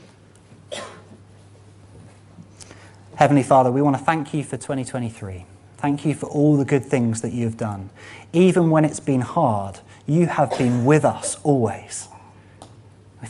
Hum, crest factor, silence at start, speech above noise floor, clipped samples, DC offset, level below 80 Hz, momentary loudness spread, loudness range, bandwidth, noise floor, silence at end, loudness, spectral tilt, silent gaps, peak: none; 22 dB; 0.7 s; 29 dB; under 0.1%; under 0.1%; -58 dBFS; 18 LU; 3 LU; 11.5 kHz; -49 dBFS; 0 s; -20 LUFS; -6.5 dB/octave; none; 0 dBFS